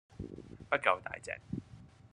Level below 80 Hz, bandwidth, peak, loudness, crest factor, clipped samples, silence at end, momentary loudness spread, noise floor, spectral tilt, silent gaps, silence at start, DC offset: -62 dBFS; 11 kHz; -10 dBFS; -35 LUFS; 28 dB; under 0.1%; 0.05 s; 22 LU; -56 dBFS; -5 dB/octave; none; 0.1 s; under 0.1%